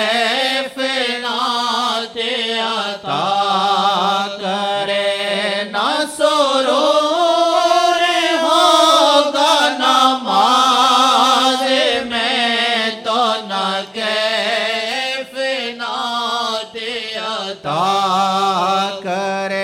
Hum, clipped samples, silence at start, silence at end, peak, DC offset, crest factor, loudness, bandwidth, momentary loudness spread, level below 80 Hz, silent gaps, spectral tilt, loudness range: none; under 0.1%; 0 s; 0 s; 0 dBFS; under 0.1%; 16 dB; -15 LUFS; 17 kHz; 9 LU; -64 dBFS; none; -2.5 dB/octave; 7 LU